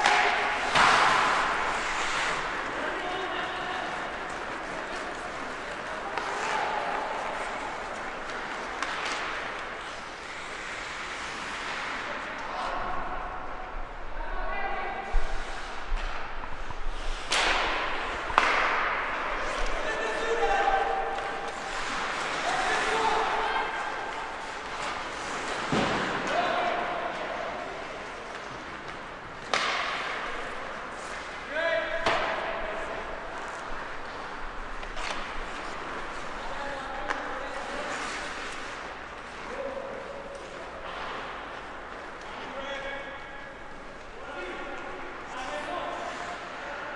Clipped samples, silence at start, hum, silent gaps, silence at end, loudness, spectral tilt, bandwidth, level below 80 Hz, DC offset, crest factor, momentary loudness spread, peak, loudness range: under 0.1%; 0 s; none; none; 0 s; -31 LUFS; -2.5 dB/octave; 11.5 kHz; -42 dBFS; under 0.1%; 30 dB; 13 LU; -2 dBFS; 10 LU